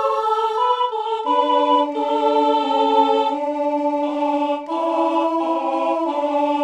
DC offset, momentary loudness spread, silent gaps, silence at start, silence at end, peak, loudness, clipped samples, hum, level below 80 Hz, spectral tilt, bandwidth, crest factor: under 0.1%; 5 LU; none; 0 s; 0 s; -4 dBFS; -19 LUFS; under 0.1%; none; -68 dBFS; -3.5 dB/octave; 9.8 kHz; 14 dB